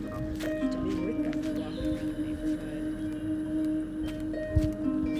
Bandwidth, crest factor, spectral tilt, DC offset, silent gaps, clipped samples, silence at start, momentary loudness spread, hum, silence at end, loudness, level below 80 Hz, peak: 15.5 kHz; 16 dB; -7.5 dB/octave; under 0.1%; none; under 0.1%; 0 s; 5 LU; none; 0 s; -32 LUFS; -42 dBFS; -14 dBFS